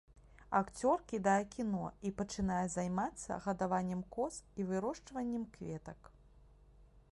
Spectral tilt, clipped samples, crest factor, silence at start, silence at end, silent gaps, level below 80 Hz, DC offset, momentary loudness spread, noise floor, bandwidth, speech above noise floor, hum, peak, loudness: -6 dB/octave; under 0.1%; 20 dB; 0.15 s; 0.1 s; none; -60 dBFS; under 0.1%; 10 LU; -62 dBFS; 11.5 kHz; 25 dB; none; -18 dBFS; -38 LUFS